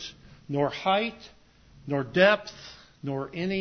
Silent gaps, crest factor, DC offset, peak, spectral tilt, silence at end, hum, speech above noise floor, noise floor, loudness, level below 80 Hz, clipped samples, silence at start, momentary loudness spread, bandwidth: none; 22 dB; under 0.1%; -8 dBFS; -6 dB/octave; 0 s; none; 29 dB; -55 dBFS; -26 LUFS; -60 dBFS; under 0.1%; 0 s; 22 LU; 6.6 kHz